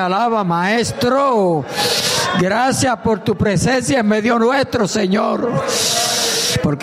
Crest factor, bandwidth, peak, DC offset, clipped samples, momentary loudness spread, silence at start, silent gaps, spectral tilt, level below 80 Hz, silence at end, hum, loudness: 12 dB; 15.5 kHz; -4 dBFS; under 0.1%; under 0.1%; 3 LU; 0 s; none; -4 dB/octave; -44 dBFS; 0 s; none; -16 LUFS